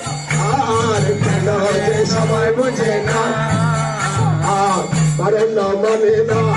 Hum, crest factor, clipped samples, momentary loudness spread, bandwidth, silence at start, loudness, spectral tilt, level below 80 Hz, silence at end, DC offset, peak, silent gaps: none; 12 dB; under 0.1%; 2 LU; 11.5 kHz; 0 s; -16 LUFS; -5.5 dB/octave; -44 dBFS; 0 s; under 0.1%; -4 dBFS; none